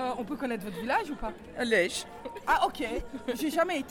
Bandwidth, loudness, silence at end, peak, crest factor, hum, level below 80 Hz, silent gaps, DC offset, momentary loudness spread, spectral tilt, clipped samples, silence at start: 18 kHz; -30 LUFS; 0 s; -12 dBFS; 18 dB; none; -50 dBFS; none; under 0.1%; 11 LU; -3.5 dB/octave; under 0.1%; 0 s